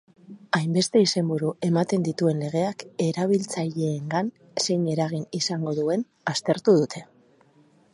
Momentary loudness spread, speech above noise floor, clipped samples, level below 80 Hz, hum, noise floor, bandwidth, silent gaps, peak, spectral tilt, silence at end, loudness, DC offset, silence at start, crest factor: 8 LU; 35 dB; under 0.1%; -70 dBFS; none; -59 dBFS; 11.5 kHz; none; -6 dBFS; -5.5 dB/octave; 0.9 s; -25 LUFS; under 0.1%; 0.3 s; 18 dB